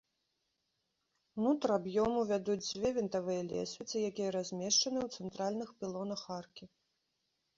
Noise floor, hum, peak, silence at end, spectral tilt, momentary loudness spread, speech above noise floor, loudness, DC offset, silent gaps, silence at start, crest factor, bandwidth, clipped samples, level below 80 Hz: -83 dBFS; none; -18 dBFS; 0.9 s; -4.5 dB/octave; 11 LU; 48 dB; -35 LUFS; under 0.1%; none; 1.35 s; 18 dB; 7.6 kHz; under 0.1%; -68 dBFS